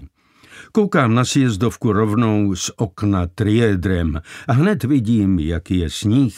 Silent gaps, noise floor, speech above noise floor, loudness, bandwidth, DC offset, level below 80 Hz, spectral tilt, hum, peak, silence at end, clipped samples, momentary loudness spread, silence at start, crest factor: none; -48 dBFS; 31 dB; -18 LUFS; 15.5 kHz; under 0.1%; -36 dBFS; -6.5 dB/octave; none; -2 dBFS; 0 s; under 0.1%; 6 LU; 0 s; 16 dB